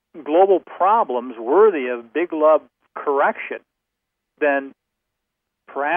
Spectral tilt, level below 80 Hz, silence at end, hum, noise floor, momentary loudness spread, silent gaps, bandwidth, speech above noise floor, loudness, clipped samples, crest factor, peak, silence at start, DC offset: -8.5 dB/octave; -82 dBFS; 0 s; none; -80 dBFS; 15 LU; none; 3.6 kHz; 62 dB; -19 LUFS; under 0.1%; 18 dB; -2 dBFS; 0.15 s; under 0.1%